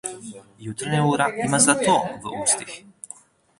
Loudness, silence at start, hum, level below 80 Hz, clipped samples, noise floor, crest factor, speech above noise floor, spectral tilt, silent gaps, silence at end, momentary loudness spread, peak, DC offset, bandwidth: -20 LUFS; 0.05 s; none; -60 dBFS; under 0.1%; -46 dBFS; 22 dB; 24 dB; -3.5 dB/octave; none; 0.8 s; 23 LU; -2 dBFS; under 0.1%; 11.5 kHz